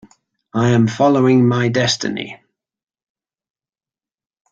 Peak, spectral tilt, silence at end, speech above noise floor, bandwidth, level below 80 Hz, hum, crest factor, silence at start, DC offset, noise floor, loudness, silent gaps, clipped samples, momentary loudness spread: -2 dBFS; -6 dB/octave; 2.15 s; over 75 dB; 7.8 kHz; -56 dBFS; none; 16 dB; 0.55 s; under 0.1%; under -90 dBFS; -15 LUFS; none; under 0.1%; 13 LU